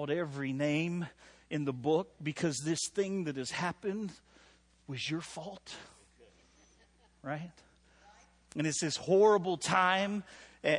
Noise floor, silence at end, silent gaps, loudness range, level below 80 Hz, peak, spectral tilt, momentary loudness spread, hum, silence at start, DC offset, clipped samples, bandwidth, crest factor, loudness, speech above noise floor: -66 dBFS; 0 s; none; 13 LU; -70 dBFS; -14 dBFS; -4.5 dB/octave; 17 LU; none; 0 s; under 0.1%; under 0.1%; 11.5 kHz; 20 dB; -33 LUFS; 33 dB